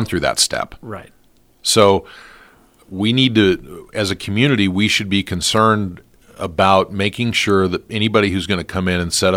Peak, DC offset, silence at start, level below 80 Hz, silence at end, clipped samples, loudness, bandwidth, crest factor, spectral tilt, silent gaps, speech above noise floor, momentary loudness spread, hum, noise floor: 0 dBFS; under 0.1%; 0 s; -46 dBFS; 0 s; under 0.1%; -16 LUFS; 16.5 kHz; 18 dB; -4 dB/octave; none; 32 dB; 13 LU; none; -49 dBFS